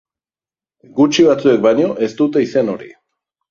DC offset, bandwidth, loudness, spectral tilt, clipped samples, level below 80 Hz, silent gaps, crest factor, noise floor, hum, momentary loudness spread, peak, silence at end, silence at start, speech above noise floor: under 0.1%; 7.6 kHz; -14 LUFS; -5.5 dB/octave; under 0.1%; -58 dBFS; none; 14 dB; under -90 dBFS; none; 10 LU; -2 dBFS; 0.6 s; 0.95 s; over 76 dB